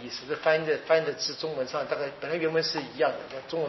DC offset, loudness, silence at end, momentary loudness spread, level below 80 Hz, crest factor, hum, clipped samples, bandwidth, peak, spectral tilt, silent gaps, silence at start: under 0.1%; -28 LUFS; 0 s; 7 LU; -70 dBFS; 18 dB; none; under 0.1%; 6.2 kHz; -10 dBFS; -2 dB/octave; none; 0 s